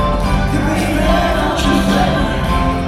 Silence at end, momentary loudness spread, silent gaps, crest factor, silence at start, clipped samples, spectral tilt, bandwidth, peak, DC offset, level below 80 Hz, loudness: 0 s; 3 LU; none; 12 dB; 0 s; under 0.1%; -5.5 dB/octave; 15 kHz; -2 dBFS; under 0.1%; -20 dBFS; -15 LUFS